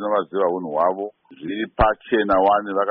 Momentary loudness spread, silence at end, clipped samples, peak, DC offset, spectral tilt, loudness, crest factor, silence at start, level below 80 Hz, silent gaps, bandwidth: 13 LU; 0 s; under 0.1%; -6 dBFS; under 0.1%; -4 dB/octave; -21 LUFS; 14 dB; 0 s; -38 dBFS; none; 5.4 kHz